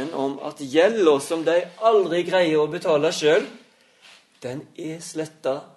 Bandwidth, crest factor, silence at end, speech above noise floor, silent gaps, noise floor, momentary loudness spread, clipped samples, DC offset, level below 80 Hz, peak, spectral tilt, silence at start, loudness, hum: 12 kHz; 18 dB; 0.1 s; 32 dB; none; -53 dBFS; 15 LU; under 0.1%; under 0.1%; -72 dBFS; -4 dBFS; -4.5 dB/octave; 0 s; -21 LUFS; none